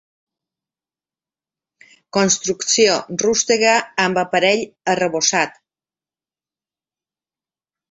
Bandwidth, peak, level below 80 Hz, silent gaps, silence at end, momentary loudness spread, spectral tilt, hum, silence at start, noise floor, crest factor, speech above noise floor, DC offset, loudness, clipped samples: 8.2 kHz; -2 dBFS; -62 dBFS; none; 2.45 s; 6 LU; -2 dB/octave; none; 2.15 s; under -90 dBFS; 20 dB; over 73 dB; under 0.1%; -17 LUFS; under 0.1%